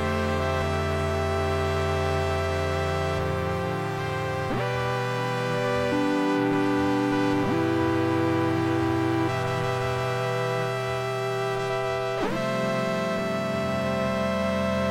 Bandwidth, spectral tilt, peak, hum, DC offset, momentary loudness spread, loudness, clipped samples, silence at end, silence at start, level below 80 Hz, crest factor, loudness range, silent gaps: 16.5 kHz; -6 dB/octave; -12 dBFS; none; under 0.1%; 4 LU; -26 LUFS; under 0.1%; 0 s; 0 s; -50 dBFS; 12 dB; 3 LU; none